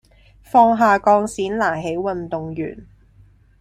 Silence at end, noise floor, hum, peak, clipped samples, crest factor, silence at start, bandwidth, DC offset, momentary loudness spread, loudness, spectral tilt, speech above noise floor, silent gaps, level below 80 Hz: 0.75 s; -51 dBFS; none; -2 dBFS; under 0.1%; 18 dB; 0.55 s; 13 kHz; under 0.1%; 14 LU; -18 LUFS; -6 dB/octave; 33 dB; none; -50 dBFS